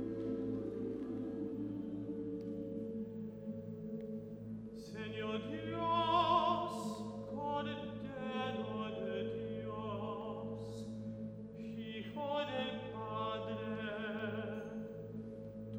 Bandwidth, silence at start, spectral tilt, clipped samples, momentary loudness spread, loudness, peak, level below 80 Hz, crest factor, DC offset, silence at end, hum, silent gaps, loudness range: over 20 kHz; 0 s; -6.5 dB/octave; under 0.1%; 11 LU; -41 LUFS; -20 dBFS; -66 dBFS; 20 dB; under 0.1%; 0 s; none; none; 7 LU